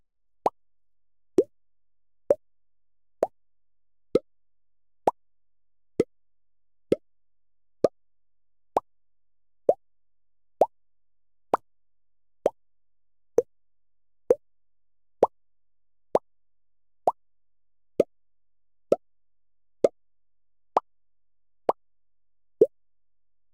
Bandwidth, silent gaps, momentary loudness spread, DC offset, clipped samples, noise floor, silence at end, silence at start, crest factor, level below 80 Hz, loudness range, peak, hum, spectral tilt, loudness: 15.5 kHz; none; 5 LU; 0.1%; under 0.1%; under -90 dBFS; 0.85 s; 0.45 s; 26 dB; -68 dBFS; 3 LU; -6 dBFS; none; -6.5 dB/octave; -29 LUFS